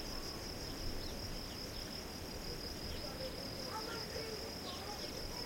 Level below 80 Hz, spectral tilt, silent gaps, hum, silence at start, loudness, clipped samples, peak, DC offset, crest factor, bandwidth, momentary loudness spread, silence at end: -52 dBFS; -3.5 dB/octave; none; none; 0 s; -44 LUFS; under 0.1%; -30 dBFS; under 0.1%; 14 dB; 16.5 kHz; 2 LU; 0 s